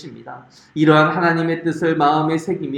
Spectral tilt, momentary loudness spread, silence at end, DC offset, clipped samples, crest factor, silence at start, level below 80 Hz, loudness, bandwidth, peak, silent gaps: -7 dB/octave; 21 LU; 0 s; under 0.1%; under 0.1%; 18 dB; 0 s; -62 dBFS; -17 LUFS; 10.5 kHz; 0 dBFS; none